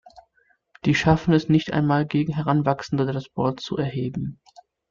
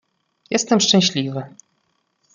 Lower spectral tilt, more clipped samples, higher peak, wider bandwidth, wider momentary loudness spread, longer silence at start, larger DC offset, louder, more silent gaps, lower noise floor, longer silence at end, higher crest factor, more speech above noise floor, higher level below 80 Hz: first, -7 dB/octave vs -3.5 dB/octave; neither; second, -6 dBFS vs -2 dBFS; second, 7.4 kHz vs 9.6 kHz; second, 9 LU vs 16 LU; second, 0.15 s vs 0.5 s; neither; second, -23 LUFS vs -17 LUFS; neither; second, -65 dBFS vs -69 dBFS; second, 0.55 s vs 0.85 s; about the same, 18 dB vs 20 dB; second, 43 dB vs 50 dB; first, -48 dBFS vs -64 dBFS